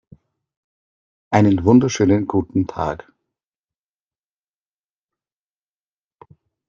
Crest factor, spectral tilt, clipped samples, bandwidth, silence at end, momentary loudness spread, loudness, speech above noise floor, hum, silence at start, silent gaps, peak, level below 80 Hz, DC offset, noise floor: 20 dB; -7 dB/octave; under 0.1%; 7.4 kHz; 3.7 s; 12 LU; -17 LUFS; over 74 dB; 50 Hz at -50 dBFS; 1.3 s; none; -2 dBFS; -52 dBFS; under 0.1%; under -90 dBFS